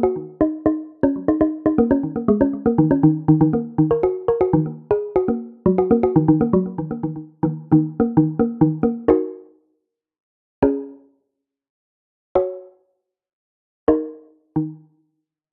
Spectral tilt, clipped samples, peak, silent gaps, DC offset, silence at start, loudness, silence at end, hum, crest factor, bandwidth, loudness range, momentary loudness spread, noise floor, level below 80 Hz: -13 dB/octave; under 0.1%; 0 dBFS; 10.20-10.62 s, 11.69-12.35 s, 13.33-13.87 s; under 0.1%; 0 s; -19 LUFS; 0.75 s; none; 20 dB; 3.2 kHz; 9 LU; 10 LU; -77 dBFS; -46 dBFS